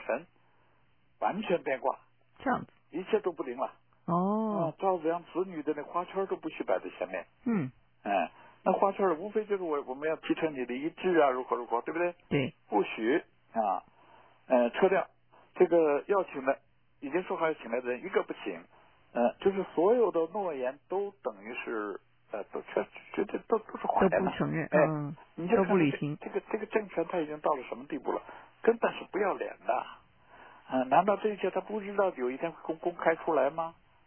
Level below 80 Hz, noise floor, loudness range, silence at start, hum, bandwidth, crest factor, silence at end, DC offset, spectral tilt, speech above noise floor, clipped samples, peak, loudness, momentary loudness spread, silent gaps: -68 dBFS; -70 dBFS; 5 LU; 0 s; none; 3.4 kHz; 20 dB; 0.35 s; under 0.1%; -10 dB/octave; 40 dB; under 0.1%; -12 dBFS; -31 LUFS; 11 LU; none